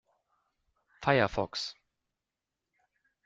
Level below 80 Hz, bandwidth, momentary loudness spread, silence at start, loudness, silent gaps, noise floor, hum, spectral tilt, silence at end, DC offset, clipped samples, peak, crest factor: -60 dBFS; 9 kHz; 11 LU; 1 s; -31 LUFS; none; -89 dBFS; none; -5 dB/octave; 1.55 s; under 0.1%; under 0.1%; -8 dBFS; 26 dB